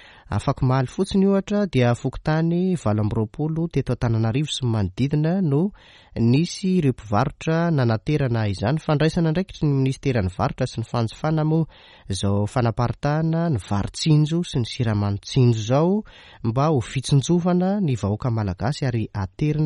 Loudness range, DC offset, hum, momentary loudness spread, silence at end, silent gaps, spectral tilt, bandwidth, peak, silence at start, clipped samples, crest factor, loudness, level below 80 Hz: 2 LU; under 0.1%; none; 6 LU; 0 s; none; -7 dB/octave; 11.5 kHz; -6 dBFS; 0.3 s; under 0.1%; 16 dB; -22 LUFS; -44 dBFS